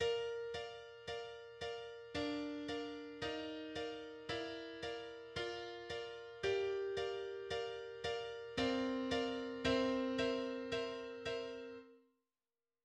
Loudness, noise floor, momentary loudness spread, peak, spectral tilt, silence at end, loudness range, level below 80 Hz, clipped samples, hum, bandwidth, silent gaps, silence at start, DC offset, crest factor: -42 LUFS; under -90 dBFS; 10 LU; -22 dBFS; -4.5 dB/octave; 0.85 s; 6 LU; -68 dBFS; under 0.1%; none; 10 kHz; none; 0 s; under 0.1%; 20 dB